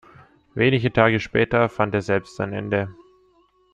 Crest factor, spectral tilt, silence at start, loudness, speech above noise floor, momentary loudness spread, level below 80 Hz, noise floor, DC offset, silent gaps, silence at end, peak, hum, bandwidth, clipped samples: 20 dB; -7 dB/octave; 0.55 s; -21 LUFS; 39 dB; 10 LU; -50 dBFS; -60 dBFS; under 0.1%; none; 0.8 s; -2 dBFS; none; 9.2 kHz; under 0.1%